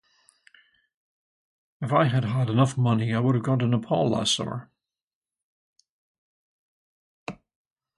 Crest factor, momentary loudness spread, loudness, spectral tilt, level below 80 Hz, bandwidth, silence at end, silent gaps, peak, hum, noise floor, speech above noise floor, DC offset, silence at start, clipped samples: 20 dB; 17 LU; -24 LUFS; -6 dB/octave; -62 dBFS; 11.5 kHz; 0.65 s; 5.02-5.22 s, 5.42-5.73 s, 5.89-7.26 s; -8 dBFS; none; -61 dBFS; 38 dB; under 0.1%; 1.8 s; under 0.1%